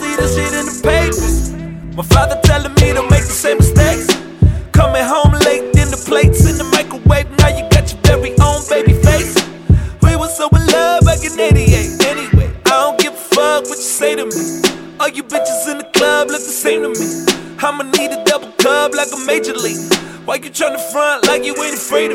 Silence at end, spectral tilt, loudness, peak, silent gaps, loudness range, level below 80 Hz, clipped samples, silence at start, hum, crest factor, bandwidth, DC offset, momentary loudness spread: 0 s; -4.5 dB/octave; -13 LUFS; 0 dBFS; none; 4 LU; -20 dBFS; under 0.1%; 0 s; none; 12 dB; 17 kHz; under 0.1%; 7 LU